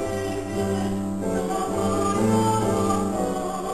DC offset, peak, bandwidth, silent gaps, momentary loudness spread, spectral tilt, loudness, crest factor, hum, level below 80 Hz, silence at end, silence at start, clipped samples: 0.7%; -10 dBFS; 14 kHz; none; 6 LU; -6 dB/octave; -24 LUFS; 14 dB; none; -44 dBFS; 0 s; 0 s; under 0.1%